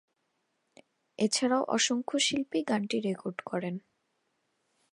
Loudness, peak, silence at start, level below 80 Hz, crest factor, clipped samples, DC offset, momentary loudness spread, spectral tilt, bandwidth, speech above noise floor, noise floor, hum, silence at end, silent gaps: -30 LUFS; -14 dBFS; 1.2 s; -76 dBFS; 20 dB; under 0.1%; under 0.1%; 9 LU; -3 dB/octave; 11.5 kHz; 48 dB; -78 dBFS; none; 1.15 s; none